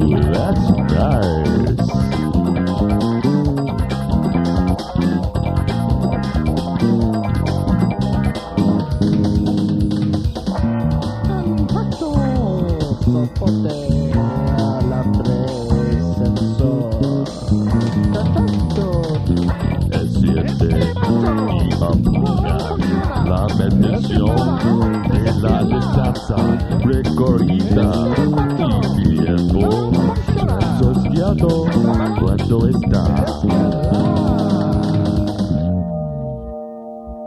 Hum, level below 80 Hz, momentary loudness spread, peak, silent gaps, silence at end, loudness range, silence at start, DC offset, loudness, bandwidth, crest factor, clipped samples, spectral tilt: none; -26 dBFS; 4 LU; 0 dBFS; none; 0 s; 2 LU; 0 s; under 0.1%; -17 LUFS; 12.5 kHz; 16 dB; under 0.1%; -8.5 dB/octave